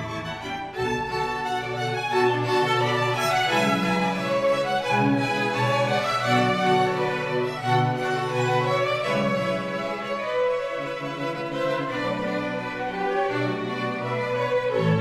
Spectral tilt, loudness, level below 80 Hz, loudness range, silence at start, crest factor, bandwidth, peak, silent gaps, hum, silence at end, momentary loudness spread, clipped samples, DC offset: -5.5 dB/octave; -24 LUFS; -56 dBFS; 5 LU; 0 s; 16 dB; 14 kHz; -8 dBFS; none; none; 0 s; 7 LU; under 0.1%; under 0.1%